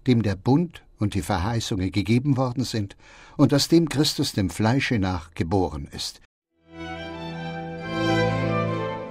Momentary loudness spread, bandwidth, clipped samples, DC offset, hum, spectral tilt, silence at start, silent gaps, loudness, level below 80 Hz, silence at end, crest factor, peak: 13 LU; 16 kHz; under 0.1%; under 0.1%; none; -5.5 dB/octave; 0.05 s; 6.25-6.42 s; -24 LUFS; -46 dBFS; 0 s; 20 dB; -4 dBFS